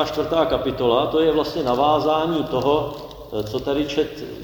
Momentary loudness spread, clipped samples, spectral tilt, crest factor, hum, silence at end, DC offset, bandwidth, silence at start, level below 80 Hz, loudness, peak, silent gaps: 9 LU; under 0.1%; -6 dB/octave; 16 dB; none; 0 s; under 0.1%; over 20 kHz; 0 s; -44 dBFS; -21 LUFS; -4 dBFS; none